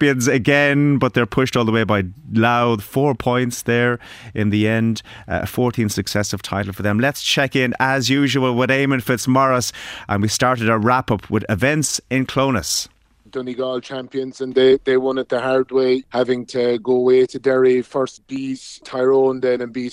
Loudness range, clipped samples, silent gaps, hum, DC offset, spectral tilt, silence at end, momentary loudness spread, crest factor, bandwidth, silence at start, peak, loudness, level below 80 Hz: 3 LU; under 0.1%; none; none; under 0.1%; -5 dB/octave; 0 s; 10 LU; 16 dB; 16 kHz; 0 s; -2 dBFS; -18 LUFS; -48 dBFS